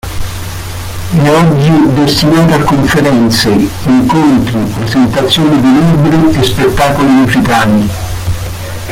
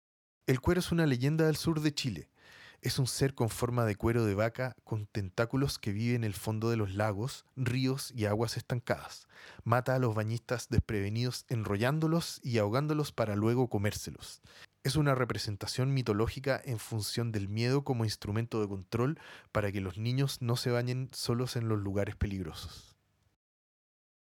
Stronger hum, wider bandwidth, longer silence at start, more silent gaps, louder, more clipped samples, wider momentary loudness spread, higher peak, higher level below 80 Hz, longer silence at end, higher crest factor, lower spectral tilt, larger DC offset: neither; about the same, 16.5 kHz vs 18 kHz; second, 0.05 s vs 0.45 s; neither; first, -8 LUFS vs -33 LUFS; neither; first, 13 LU vs 8 LU; first, 0 dBFS vs -10 dBFS; first, -26 dBFS vs -54 dBFS; second, 0 s vs 1.45 s; second, 8 dB vs 22 dB; about the same, -6 dB/octave vs -6 dB/octave; neither